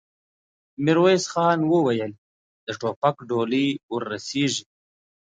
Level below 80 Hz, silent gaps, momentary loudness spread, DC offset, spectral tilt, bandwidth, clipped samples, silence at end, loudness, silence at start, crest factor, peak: -68 dBFS; 2.18-2.67 s, 2.96-3.02 s, 3.83-3.89 s; 11 LU; under 0.1%; -5 dB/octave; 9.4 kHz; under 0.1%; 0.7 s; -23 LUFS; 0.8 s; 18 dB; -6 dBFS